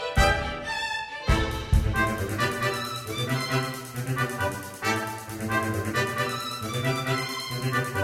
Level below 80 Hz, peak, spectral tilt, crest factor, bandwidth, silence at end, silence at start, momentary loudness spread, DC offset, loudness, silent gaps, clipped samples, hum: -34 dBFS; -6 dBFS; -4.5 dB/octave; 20 dB; 16.5 kHz; 0 s; 0 s; 6 LU; under 0.1%; -27 LUFS; none; under 0.1%; none